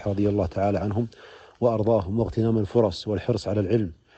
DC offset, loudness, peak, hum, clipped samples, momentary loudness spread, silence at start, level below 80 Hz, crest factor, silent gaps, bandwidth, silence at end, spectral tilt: under 0.1%; -25 LUFS; -6 dBFS; none; under 0.1%; 5 LU; 0 s; -48 dBFS; 18 dB; none; 8.6 kHz; 0.25 s; -8.5 dB/octave